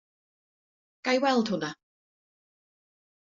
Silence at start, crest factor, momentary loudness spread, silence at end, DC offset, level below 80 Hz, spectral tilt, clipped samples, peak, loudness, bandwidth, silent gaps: 1.05 s; 22 dB; 11 LU; 1.55 s; under 0.1%; -76 dBFS; -3 dB/octave; under 0.1%; -10 dBFS; -28 LUFS; 7.4 kHz; none